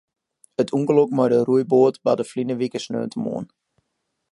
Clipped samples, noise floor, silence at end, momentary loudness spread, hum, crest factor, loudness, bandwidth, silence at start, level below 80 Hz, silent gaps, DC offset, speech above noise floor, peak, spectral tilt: under 0.1%; -76 dBFS; 0.85 s; 11 LU; none; 18 dB; -21 LUFS; 11.5 kHz; 0.6 s; -70 dBFS; none; under 0.1%; 56 dB; -4 dBFS; -7 dB/octave